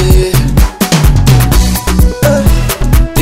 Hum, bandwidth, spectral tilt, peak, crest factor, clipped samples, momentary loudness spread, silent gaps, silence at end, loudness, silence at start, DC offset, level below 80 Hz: none; 16.5 kHz; -5.5 dB/octave; 0 dBFS; 8 dB; 1%; 4 LU; none; 0 s; -9 LUFS; 0 s; 5%; -10 dBFS